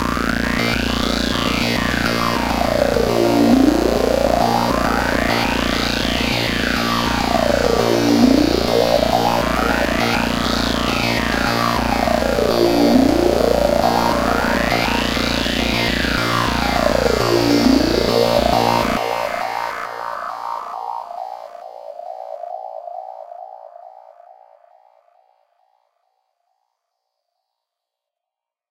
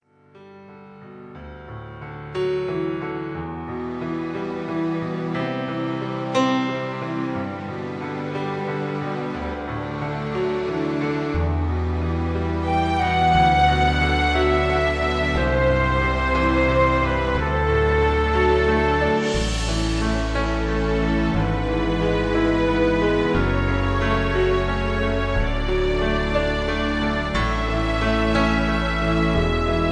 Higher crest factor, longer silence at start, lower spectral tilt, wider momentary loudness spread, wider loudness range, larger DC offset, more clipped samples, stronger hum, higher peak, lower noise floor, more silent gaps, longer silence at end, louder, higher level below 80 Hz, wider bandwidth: about the same, 18 dB vs 16 dB; second, 0 s vs 0.35 s; second, -4.5 dB/octave vs -6.5 dB/octave; first, 16 LU vs 10 LU; first, 14 LU vs 8 LU; neither; neither; neither; first, 0 dBFS vs -6 dBFS; first, -86 dBFS vs -48 dBFS; neither; first, 4.35 s vs 0 s; first, -17 LUFS vs -22 LUFS; about the same, -32 dBFS vs -28 dBFS; first, 17 kHz vs 11 kHz